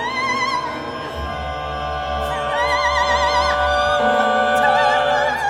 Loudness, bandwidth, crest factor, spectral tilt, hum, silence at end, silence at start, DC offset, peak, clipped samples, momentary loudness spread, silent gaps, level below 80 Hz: -18 LUFS; 16 kHz; 16 dB; -3.5 dB/octave; none; 0 s; 0 s; under 0.1%; -4 dBFS; under 0.1%; 11 LU; none; -36 dBFS